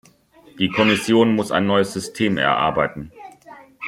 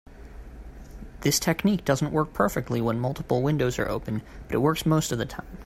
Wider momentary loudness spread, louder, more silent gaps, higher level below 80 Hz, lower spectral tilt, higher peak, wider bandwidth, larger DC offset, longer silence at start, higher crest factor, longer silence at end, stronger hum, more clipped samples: second, 9 LU vs 21 LU; first, -19 LUFS vs -26 LUFS; neither; second, -54 dBFS vs -44 dBFS; about the same, -5 dB/octave vs -5 dB/octave; first, -2 dBFS vs -8 dBFS; about the same, 15.5 kHz vs 16 kHz; neither; first, 0.55 s vs 0.1 s; about the same, 18 dB vs 18 dB; about the same, 0 s vs 0 s; neither; neither